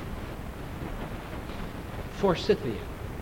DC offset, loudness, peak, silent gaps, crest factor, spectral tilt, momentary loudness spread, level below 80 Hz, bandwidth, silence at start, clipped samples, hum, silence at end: under 0.1%; -32 LUFS; -12 dBFS; none; 20 dB; -6.5 dB/octave; 12 LU; -42 dBFS; 17 kHz; 0 s; under 0.1%; none; 0 s